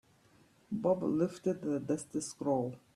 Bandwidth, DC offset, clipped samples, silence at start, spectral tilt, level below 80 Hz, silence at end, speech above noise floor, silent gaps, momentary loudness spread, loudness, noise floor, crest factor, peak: 13.5 kHz; under 0.1%; under 0.1%; 0.7 s; -6.5 dB/octave; -72 dBFS; 0.15 s; 32 dB; none; 6 LU; -35 LUFS; -65 dBFS; 18 dB; -18 dBFS